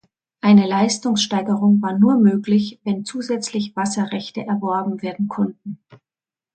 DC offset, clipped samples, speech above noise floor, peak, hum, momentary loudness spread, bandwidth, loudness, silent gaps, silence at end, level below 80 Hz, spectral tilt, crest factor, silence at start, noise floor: under 0.1%; under 0.1%; over 72 dB; -2 dBFS; none; 11 LU; 9.2 kHz; -19 LUFS; none; 0.6 s; -64 dBFS; -5.5 dB/octave; 16 dB; 0.45 s; under -90 dBFS